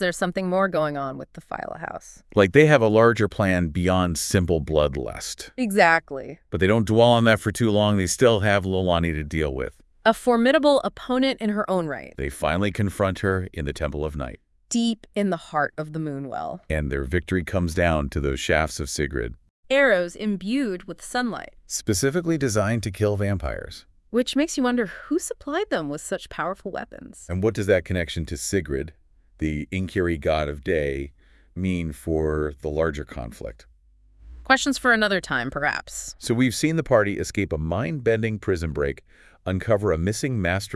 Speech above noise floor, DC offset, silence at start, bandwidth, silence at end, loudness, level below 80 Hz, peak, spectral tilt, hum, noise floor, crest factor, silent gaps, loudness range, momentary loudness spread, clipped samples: 33 dB; under 0.1%; 0 s; 12 kHz; 0 s; -23 LUFS; -42 dBFS; 0 dBFS; -5 dB/octave; none; -56 dBFS; 22 dB; 19.50-19.63 s; 7 LU; 14 LU; under 0.1%